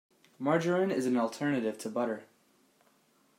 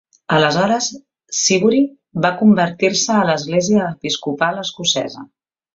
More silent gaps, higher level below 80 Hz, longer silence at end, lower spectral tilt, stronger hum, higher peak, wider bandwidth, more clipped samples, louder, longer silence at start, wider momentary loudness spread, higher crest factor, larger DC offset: neither; second, -80 dBFS vs -58 dBFS; first, 1.15 s vs 0.5 s; first, -6 dB/octave vs -4 dB/octave; neither; second, -14 dBFS vs -2 dBFS; first, 16 kHz vs 7.8 kHz; neither; second, -31 LUFS vs -16 LUFS; about the same, 0.4 s vs 0.3 s; about the same, 7 LU vs 8 LU; about the same, 18 dB vs 16 dB; neither